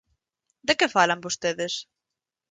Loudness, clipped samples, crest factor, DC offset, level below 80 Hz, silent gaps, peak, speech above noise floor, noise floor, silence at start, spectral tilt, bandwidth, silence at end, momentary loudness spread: -24 LUFS; under 0.1%; 22 dB; under 0.1%; -66 dBFS; none; -6 dBFS; 63 dB; -87 dBFS; 0.65 s; -2.5 dB/octave; 9.6 kHz; 0.7 s; 11 LU